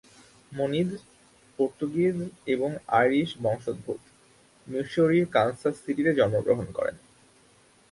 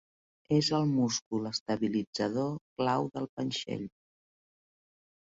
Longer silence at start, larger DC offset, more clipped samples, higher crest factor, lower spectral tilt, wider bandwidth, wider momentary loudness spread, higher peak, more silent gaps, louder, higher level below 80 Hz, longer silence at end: about the same, 0.5 s vs 0.5 s; neither; neither; about the same, 20 dB vs 16 dB; first, -7 dB/octave vs -5 dB/octave; first, 11.5 kHz vs 8 kHz; first, 11 LU vs 8 LU; first, -8 dBFS vs -16 dBFS; second, none vs 1.22-1.31 s, 1.60-1.66 s, 2.07-2.13 s, 2.61-2.76 s, 3.29-3.37 s; first, -27 LUFS vs -32 LUFS; first, -62 dBFS vs -68 dBFS; second, 0.95 s vs 1.35 s